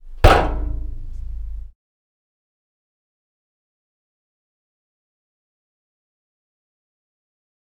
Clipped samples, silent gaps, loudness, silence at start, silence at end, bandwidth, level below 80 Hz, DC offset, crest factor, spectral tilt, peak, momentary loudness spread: under 0.1%; none; -18 LUFS; 0.05 s; 6.05 s; 16 kHz; -28 dBFS; under 0.1%; 26 dB; -6 dB/octave; 0 dBFS; 21 LU